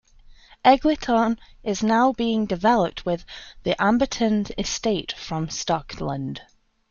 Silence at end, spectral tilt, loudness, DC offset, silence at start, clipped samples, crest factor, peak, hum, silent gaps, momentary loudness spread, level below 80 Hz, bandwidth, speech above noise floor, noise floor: 0.5 s; -4.5 dB/octave; -23 LUFS; under 0.1%; 0.65 s; under 0.1%; 20 dB; -2 dBFS; none; none; 11 LU; -46 dBFS; 7.4 kHz; 27 dB; -49 dBFS